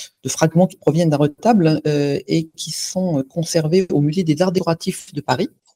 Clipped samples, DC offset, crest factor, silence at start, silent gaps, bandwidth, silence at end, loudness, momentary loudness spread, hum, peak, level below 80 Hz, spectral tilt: under 0.1%; under 0.1%; 18 dB; 0 s; none; 16 kHz; 0.25 s; -18 LUFS; 7 LU; none; 0 dBFS; -56 dBFS; -6 dB/octave